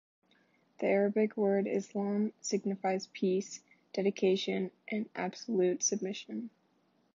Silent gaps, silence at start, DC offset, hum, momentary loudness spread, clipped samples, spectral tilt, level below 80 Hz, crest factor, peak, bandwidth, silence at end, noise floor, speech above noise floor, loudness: none; 0.8 s; under 0.1%; none; 11 LU; under 0.1%; -4.5 dB/octave; -86 dBFS; 16 dB; -16 dBFS; 7.6 kHz; 0.65 s; -72 dBFS; 40 dB; -33 LUFS